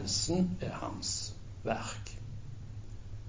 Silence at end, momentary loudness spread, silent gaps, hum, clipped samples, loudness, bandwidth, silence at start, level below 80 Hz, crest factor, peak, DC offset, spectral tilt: 0 s; 16 LU; none; none; under 0.1%; -36 LUFS; 7.8 kHz; 0 s; -50 dBFS; 20 dB; -16 dBFS; under 0.1%; -4 dB/octave